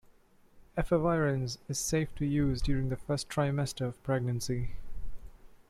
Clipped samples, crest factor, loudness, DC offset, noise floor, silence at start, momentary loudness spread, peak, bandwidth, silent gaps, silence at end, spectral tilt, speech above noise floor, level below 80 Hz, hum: under 0.1%; 16 dB; -32 LUFS; under 0.1%; -61 dBFS; 0.55 s; 12 LU; -16 dBFS; 15 kHz; none; 0.15 s; -5.5 dB/octave; 31 dB; -44 dBFS; none